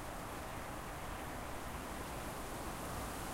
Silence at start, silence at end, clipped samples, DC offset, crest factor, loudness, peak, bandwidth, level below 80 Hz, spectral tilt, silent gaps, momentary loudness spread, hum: 0 s; 0 s; under 0.1%; under 0.1%; 12 dB; -45 LUFS; -32 dBFS; 16 kHz; -52 dBFS; -4 dB/octave; none; 2 LU; none